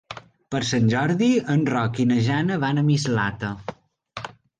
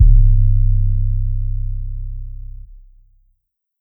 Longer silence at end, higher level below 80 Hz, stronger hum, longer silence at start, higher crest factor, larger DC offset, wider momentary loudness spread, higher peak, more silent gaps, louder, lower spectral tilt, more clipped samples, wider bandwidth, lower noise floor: second, 0.3 s vs 1.4 s; second, -54 dBFS vs -16 dBFS; neither; about the same, 0.1 s vs 0 s; about the same, 14 dB vs 14 dB; neither; second, 16 LU vs 21 LU; second, -10 dBFS vs 0 dBFS; neither; second, -22 LUFS vs -19 LUFS; second, -6 dB/octave vs -15 dB/octave; neither; first, 9.6 kHz vs 0.3 kHz; second, -41 dBFS vs -68 dBFS